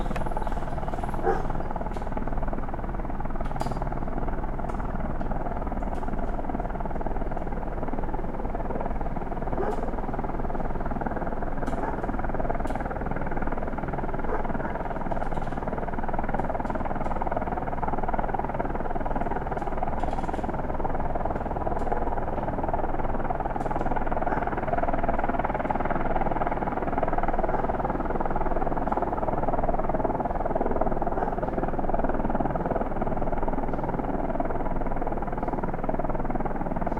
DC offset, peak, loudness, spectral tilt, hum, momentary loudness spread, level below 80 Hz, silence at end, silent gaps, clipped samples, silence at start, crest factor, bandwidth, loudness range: under 0.1%; -10 dBFS; -30 LUFS; -8.5 dB/octave; none; 5 LU; -30 dBFS; 0 s; none; under 0.1%; 0 s; 16 dB; 4.6 kHz; 4 LU